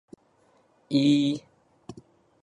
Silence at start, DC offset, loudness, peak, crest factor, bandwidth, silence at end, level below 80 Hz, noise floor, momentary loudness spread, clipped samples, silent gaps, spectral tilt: 0.9 s; under 0.1%; -24 LUFS; -12 dBFS; 18 dB; 10.5 kHz; 0.5 s; -70 dBFS; -64 dBFS; 26 LU; under 0.1%; none; -6 dB/octave